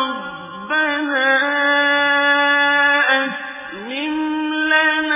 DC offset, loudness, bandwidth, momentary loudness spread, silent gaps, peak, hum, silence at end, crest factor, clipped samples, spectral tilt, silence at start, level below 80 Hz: under 0.1%; -16 LUFS; 3.8 kHz; 14 LU; none; -4 dBFS; none; 0 s; 14 dB; under 0.1%; -6 dB/octave; 0 s; -60 dBFS